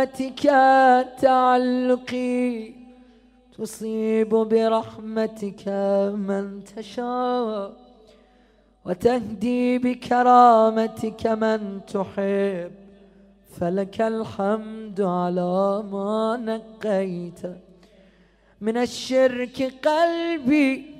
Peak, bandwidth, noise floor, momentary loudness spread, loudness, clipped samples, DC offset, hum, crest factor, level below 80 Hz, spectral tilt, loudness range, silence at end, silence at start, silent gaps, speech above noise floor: -2 dBFS; 14.5 kHz; -58 dBFS; 15 LU; -22 LUFS; under 0.1%; under 0.1%; none; 20 dB; -60 dBFS; -6 dB/octave; 7 LU; 0 s; 0 s; none; 36 dB